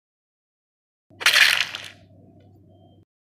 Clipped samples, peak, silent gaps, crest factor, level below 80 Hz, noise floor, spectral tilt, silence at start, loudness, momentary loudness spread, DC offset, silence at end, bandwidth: under 0.1%; -2 dBFS; none; 24 dB; -70 dBFS; -52 dBFS; 1.5 dB/octave; 1.2 s; -17 LUFS; 21 LU; under 0.1%; 1.35 s; 16 kHz